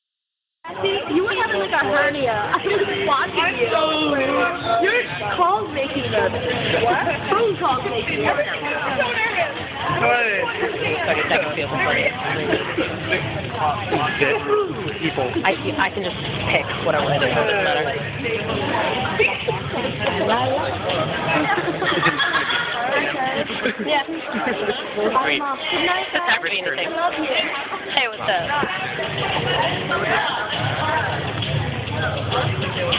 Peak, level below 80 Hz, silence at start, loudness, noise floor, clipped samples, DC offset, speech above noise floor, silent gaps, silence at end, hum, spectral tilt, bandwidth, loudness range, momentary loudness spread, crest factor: -2 dBFS; -46 dBFS; 0.65 s; -20 LUFS; -82 dBFS; under 0.1%; under 0.1%; 62 dB; none; 0 s; none; -8.5 dB/octave; 4 kHz; 2 LU; 5 LU; 20 dB